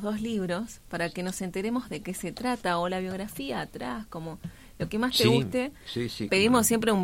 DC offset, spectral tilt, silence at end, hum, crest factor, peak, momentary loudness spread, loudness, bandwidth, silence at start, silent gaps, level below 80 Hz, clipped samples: under 0.1%; -4.5 dB/octave; 0 s; none; 20 dB; -8 dBFS; 14 LU; -28 LUFS; 16.5 kHz; 0 s; none; -54 dBFS; under 0.1%